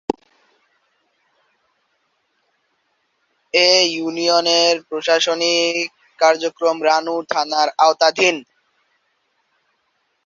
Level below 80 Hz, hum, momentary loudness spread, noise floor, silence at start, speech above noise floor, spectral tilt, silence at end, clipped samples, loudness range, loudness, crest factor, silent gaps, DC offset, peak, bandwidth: -66 dBFS; none; 8 LU; -68 dBFS; 0.1 s; 51 dB; -1.5 dB/octave; 1.85 s; under 0.1%; 4 LU; -16 LUFS; 20 dB; none; under 0.1%; 0 dBFS; 7.6 kHz